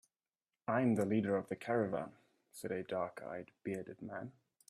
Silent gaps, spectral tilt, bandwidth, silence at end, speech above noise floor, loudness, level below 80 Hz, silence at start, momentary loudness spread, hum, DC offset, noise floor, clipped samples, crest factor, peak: none; -7.5 dB/octave; 14 kHz; 0.4 s; over 52 dB; -39 LUFS; -78 dBFS; 0.7 s; 15 LU; none; under 0.1%; under -90 dBFS; under 0.1%; 18 dB; -20 dBFS